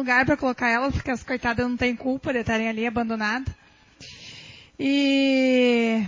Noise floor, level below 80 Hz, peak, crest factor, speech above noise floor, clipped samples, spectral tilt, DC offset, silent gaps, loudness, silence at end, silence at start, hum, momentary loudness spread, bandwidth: -48 dBFS; -44 dBFS; -8 dBFS; 14 dB; 26 dB; under 0.1%; -5.5 dB/octave; under 0.1%; none; -23 LUFS; 0 s; 0 s; none; 21 LU; 7.6 kHz